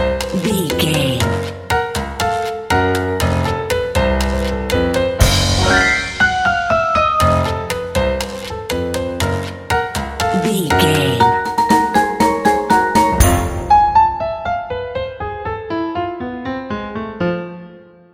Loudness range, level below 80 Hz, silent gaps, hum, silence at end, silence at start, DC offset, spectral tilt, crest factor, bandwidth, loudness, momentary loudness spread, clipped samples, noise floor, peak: 5 LU; -28 dBFS; none; none; 0.3 s; 0 s; under 0.1%; -4.5 dB/octave; 16 dB; 16.5 kHz; -16 LUFS; 11 LU; under 0.1%; -40 dBFS; 0 dBFS